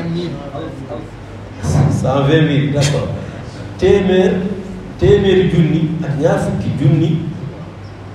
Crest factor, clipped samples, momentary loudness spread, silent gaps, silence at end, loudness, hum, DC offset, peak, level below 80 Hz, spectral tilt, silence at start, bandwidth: 14 dB; under 0.1%; 17 LU; none; 0 s; -15 LUFS; none; under 0.1%; 0 dBFS; -36 dBFS; -7 dB/octave; 0 s; 11.5 kHz